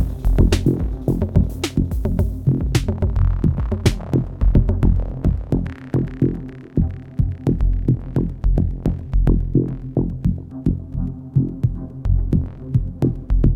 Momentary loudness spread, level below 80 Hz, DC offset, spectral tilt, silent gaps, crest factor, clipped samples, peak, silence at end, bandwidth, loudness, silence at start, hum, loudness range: 6 LU; -22 dBFS; under 0.1%; -8 dB/octave; none; 18 dB; under 0.1%; -2 dBFS; 0 s; 12.5 kHz; -21 LUFS; 0 s; none; 2 LU